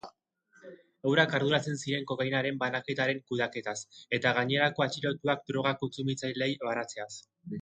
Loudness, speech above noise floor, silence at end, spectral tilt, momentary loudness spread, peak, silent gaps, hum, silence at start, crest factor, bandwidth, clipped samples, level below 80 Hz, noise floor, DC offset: -30 LUFS; 36 dB; 0 s; -4.5 dB/octave; 11 LU; -8 dBFS; none; none; 0.05 s; 24 dB; 9.4 kHz; under 0.1%; -72 dBFS; -66 dBFS; under 0.1%